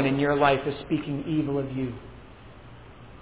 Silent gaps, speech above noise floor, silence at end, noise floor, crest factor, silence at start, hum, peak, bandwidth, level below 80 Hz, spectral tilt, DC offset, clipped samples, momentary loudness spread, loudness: none; 21 dB; 0 s; -47 dBFS; 20 dB; 0 s; none; -8 dBFS; 4 kHz; -52 dBFS; -10.5 dB/octave; 0.2%; under 0.1%; 26 LU; -26 LUFS